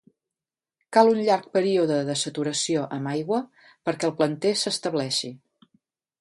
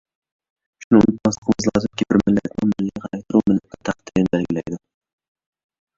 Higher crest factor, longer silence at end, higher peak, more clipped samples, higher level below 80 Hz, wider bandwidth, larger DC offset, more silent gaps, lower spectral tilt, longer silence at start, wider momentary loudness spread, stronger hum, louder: about the same, 22 dB vs 20 dB; second, 0.85 s vs 1.2 s; about the same, -4 dBFS vs -2 dBFS; neither; second, -72 dBFS vs -48 dBFS; first, 11.5 kHz vs 7.8 kHz; neither; second, none vs 0.84-0.91 s, 1.38-1.42 s; second, -4 dB/octave vs -6.5 dB/octave; about the same, 0.9 s vs 0.8 s; second, 9 LU vs 12 LU; neither; second, -24 LUFS vs -20 LUFS